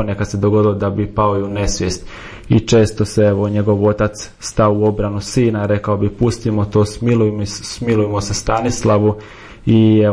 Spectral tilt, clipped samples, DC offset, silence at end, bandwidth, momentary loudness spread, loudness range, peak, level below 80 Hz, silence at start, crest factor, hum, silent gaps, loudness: -6.5 dB/octave; under 0.1%; under 0.1%; 0 s; 10.5 kHz; 9 LU; 1 LU; -2 dBFS; -34 dBFS; 0 s; 14 dB; none; none; -16 LUFS